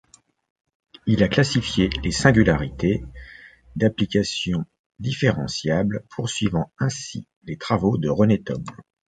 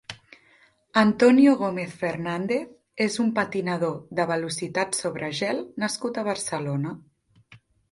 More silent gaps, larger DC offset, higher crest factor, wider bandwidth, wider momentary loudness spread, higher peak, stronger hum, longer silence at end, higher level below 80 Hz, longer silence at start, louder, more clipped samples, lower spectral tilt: first, 4.79-4.90 s, 7.36-7.41 s vs none; neither; about the same, 22 dB vs 20 dB; second, 9.4 kHz vs 11.5 kHz; first, 15 LU vs 11 LU; first, 0 dBFS vs -4 dBFS; neither; about the same, 0.25 s vs 0.35 s; first, -40 dBFS vs -66 dBFS; first, 1.05 s vs 0.1 s; about the same, -22 LUFS vs -24 LUFS; neither; about the same, -5.5 dB/octave vs -5 dB/octave